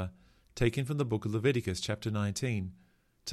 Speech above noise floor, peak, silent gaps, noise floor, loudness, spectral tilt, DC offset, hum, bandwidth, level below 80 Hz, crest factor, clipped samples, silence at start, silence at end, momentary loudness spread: 22 dB; -14 dBFS; none; -54 dBFS; -33 LUFS; -5.5 dB/octave; under 0.1%; none; 13.5 kHz; -52 dBFS; 18 dB; under 0.1%; 0 s; 0 s; 13 LU